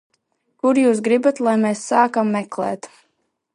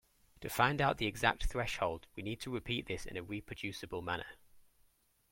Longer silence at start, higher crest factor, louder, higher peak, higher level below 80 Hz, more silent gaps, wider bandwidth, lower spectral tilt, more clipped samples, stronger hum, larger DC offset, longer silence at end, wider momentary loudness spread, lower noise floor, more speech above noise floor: first, 0.65 s vs 0.4 s; second, 18 dB vs 26 dB; first, -18 LUFS vs -37 LUFS; first, -2 dBFS vs -12 dBFS; second, -72 dBFS vs -50 dBFS; neither; second, 11 kHz vs 16.5 kHz; about the same, -5.5 dB/octave vs -4.5 dB/octave; neither; neither; neither; about the same, 0.7 s vs 0.7 s; about the same, 9 LU vs 11 LU; about the same, -70 dBFS vs -72 dBFS; first, 52 dB vs 35 dB